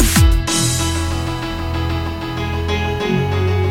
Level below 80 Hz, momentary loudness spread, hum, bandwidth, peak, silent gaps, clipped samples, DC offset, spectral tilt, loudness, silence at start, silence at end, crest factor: -22 dBFS; 8 LU; none; 17 kHz; 0 dBFS; none; under 0.1%; under 0.1%; -4.5 dB/octave; -18 LUFS; 0 s; 0 s; 16 dB